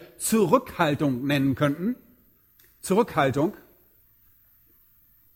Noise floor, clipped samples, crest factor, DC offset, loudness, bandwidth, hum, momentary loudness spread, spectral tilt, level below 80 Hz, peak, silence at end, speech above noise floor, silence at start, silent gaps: -60 dBFS; under 0.1%; 20 dB; under 0.1%; -24 LUFS; 17 kHz; none; 9 LU; -5.5 dB/octave; -58 dBFS; -6 dBFS; 1.8 s; 37 dB; 0 s; none